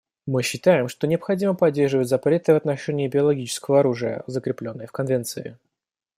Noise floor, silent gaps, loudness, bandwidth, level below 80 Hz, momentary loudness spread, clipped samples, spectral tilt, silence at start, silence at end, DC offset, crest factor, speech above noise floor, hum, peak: -85 dBFS; none; -22 LUFS; 16 kHz; -64 dBFS; 10 LU; under 0.1%; -6 dB/octave; 0.25 s; 0.65 s; under 0.1%; 18 dB; 63 dB; none; -4 dBFS